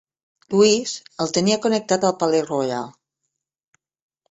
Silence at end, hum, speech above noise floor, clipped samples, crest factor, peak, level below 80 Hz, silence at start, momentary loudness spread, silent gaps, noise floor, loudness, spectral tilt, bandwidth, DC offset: 1.4 s; none; 60 dB; under 0.1%; 18 dB; -4 dBFS; -62 dBFS; 0.5 s; 11 LU; none; -79 dBFS; -20 LUFS; -4 dB/octave; 8.2 kHz; under 0.1%